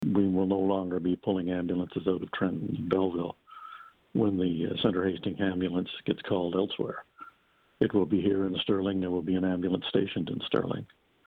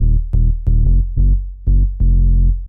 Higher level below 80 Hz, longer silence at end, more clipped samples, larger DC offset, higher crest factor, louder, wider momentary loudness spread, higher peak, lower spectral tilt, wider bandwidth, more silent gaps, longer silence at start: second, -62 dBFS vs -12 dBFS; first, 0.45 s vs 0 s; neither; neither; first, 18 dB vs 8 dB; second, -30 LUFS vs -17 LUFS; first, 9 LU vs 3 LU; second, -10 dBFS vs -4 dBFS; second, -9 dB/octave vs -15.5 dB/octave; first, 4.5 kHz vs 0.7 kHz; neither; about the same, 0 s vs 0 s